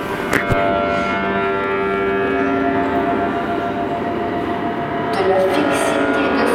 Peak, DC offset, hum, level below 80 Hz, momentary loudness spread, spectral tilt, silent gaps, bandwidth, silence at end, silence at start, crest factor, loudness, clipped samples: 0 dBFS; under 0.1%; none; -40 dBFS; 5 LU; -5.5 dB/octave; none; 15.5 kHz; 0 s; 0 s; 18 dB; -18 LUFS; under 0.1%